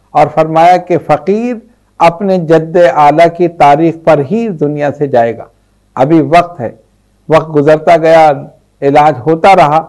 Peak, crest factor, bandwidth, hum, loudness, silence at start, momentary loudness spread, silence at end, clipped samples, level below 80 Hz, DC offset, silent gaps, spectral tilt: 0 dBFS; 8 dB; 12 kHz; none; -8 LUFS; 0.15 s; 9 LU; 0 s; 2%; -44 dBFS; 0.4%; none; -7 dB/octave